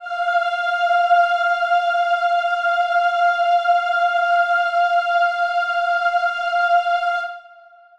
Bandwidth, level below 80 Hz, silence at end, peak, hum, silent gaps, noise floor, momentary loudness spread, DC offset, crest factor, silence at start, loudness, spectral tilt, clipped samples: 8.2 kHz; -68 dBFS; 0.55 s; -6 dBFS; none; none; -47 dBFS; 4 LU; under 0.1%; 14 dB; 0 s; -18 LUFS; 1.5 dB/octave; under 0.1%